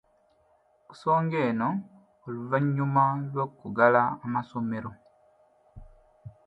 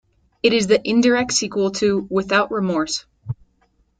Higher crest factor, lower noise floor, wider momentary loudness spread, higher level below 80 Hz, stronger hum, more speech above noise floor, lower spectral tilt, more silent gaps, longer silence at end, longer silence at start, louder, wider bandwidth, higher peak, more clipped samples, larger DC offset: about the same, 22 dB vs 18 dB; about the same, -65 dBFS vs -62 dBFS; about the same, 15 LU vs 16 LU; second, -62 dBFS vs -54 dBFS; neither; second, 39 dB vs 44 dB; first, -9.5 dB/octave vs -4 dB/octave; neither; second, 0.15 s vs 0.65 s; first, 0.9 s vs 0.45 s; second, -27 LUFS vs -19 LUFS; second, 8 kHz vs 9.4 kHz; second, -6 dBFS vs -2 dBFS; neither; neither